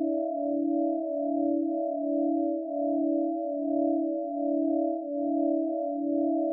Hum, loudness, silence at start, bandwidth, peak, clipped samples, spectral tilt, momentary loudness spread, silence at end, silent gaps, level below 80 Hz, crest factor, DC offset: none; -29 LUFS; 0 s; 0.8 kHz; -16 dBFS; under 0.1%; -13 dB/octave; 3 LU; 0 s; none; under -90 dBFS; 12 dB; under 0.1%